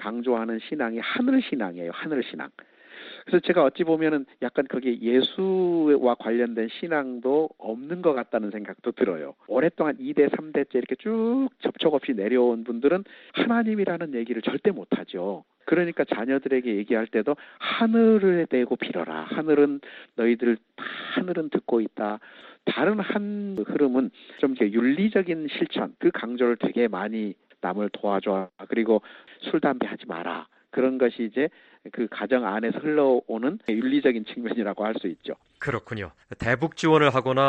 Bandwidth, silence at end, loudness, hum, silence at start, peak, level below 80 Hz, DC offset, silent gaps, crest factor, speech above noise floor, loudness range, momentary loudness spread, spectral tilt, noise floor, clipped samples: 8.2 kHz; 0 s; -25 LUFS; none; 0 s; -4 dBFS; -66 dBFS; under 0.1%; none; 20 dB; 20 dB; 4 LU; 11 LU; -7 dB/octave; -44 dBFS; under 0.1%